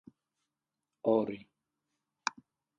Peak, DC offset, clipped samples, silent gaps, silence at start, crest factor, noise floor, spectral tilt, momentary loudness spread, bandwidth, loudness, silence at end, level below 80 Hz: -12 dBFS; under 0.1%; under 0.1%; none; 1.05 s; 26 dB; -89 dBFS; -4.5 dB/octave; 9 LU; 8.8 kHz; -34 LUFS; 0.5 s; -80 dBFS